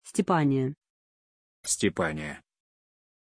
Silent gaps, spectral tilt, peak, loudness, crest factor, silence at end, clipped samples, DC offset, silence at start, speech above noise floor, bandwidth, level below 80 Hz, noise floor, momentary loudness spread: 0.90-1.63 s; -4.5 dB/octave; -10 dBFS; -27 LUFS; 20 dB; 0.9 s; under 0.1%; under 0.1%; 0.05 s; over 63 dB; 11 kHz; -60 dBFS; under -90 dBFS; 14 LU